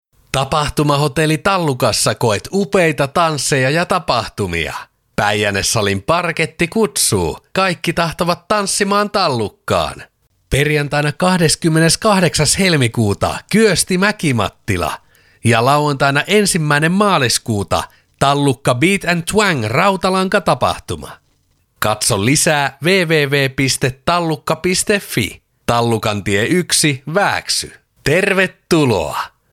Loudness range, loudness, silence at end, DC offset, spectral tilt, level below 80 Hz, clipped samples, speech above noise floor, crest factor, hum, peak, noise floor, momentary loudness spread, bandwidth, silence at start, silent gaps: 3 LU; -15 LUFS; 0.25 s; under 0.1%; -4 dB/octave; -40 dBFS; under 0.1%; 44 dB; 16 dB; none; 0 dBFS; -59 dBFS; 7 LU; 17 kHz; 0.35 s; none